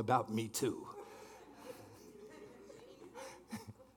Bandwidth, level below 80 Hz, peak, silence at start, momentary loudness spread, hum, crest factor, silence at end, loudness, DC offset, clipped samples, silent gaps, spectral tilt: 18 kHz; -78 dBFS; -18 dBFS; 0 s; 20 LU; none; 24 dB; 0.05 s; -42 LUFS; under 0.1%; under 0.1%; none; -5 dB/octave